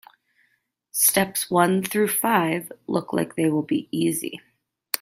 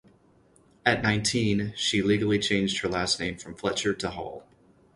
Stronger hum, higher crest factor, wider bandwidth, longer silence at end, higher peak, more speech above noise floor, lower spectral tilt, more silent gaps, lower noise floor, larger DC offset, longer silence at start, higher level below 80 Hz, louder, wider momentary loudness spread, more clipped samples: neither; about the same, 22 dB vs 22 dB; first, 16 kHz vs 11.5 kHz; second, 0.05 s vs 0.55 s; first, -2 dBFS vs -6 dBFS; first, 47 dB vs 34 dB; about the same, -4 dB/octave vs -4 dB/octave; neither; first, -69 dBFS vs -60 dBFS; neither; about the same, 0.95 s vs 0.85 s; second, -66 dBFS vs -52 dBFS; first, -22 LUFS vs -26 LUFS; about the same, 11 LU vs 9 LU; neither